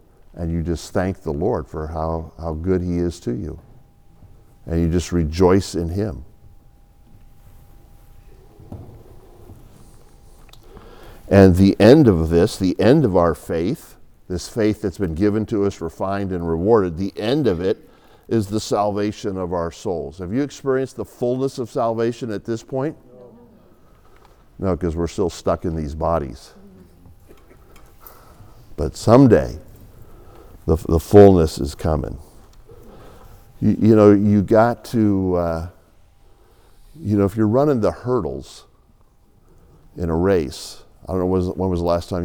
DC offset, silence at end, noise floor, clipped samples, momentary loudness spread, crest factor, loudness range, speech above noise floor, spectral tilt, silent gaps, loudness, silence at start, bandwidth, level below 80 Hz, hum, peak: under 0.1%; 0 s; -53 dBFS; under 0.1%; 16 LU; 20 dB; 10 LU; 35 dB; -7.5 dB/octave; none; -19 LUFS; 0.35 s; over 20 kHz; -40 dBFS; none; 0 dBFS